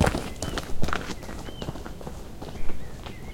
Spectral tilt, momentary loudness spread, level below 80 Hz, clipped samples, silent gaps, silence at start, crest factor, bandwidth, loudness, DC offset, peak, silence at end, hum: -5 dB/octave; 10 LU; -36 dBFS; under 0.1%; none; 0 s; 20 dB; 16 kHz; -34 LUFS; under 0.1%; -6 dBFS; 0 s; none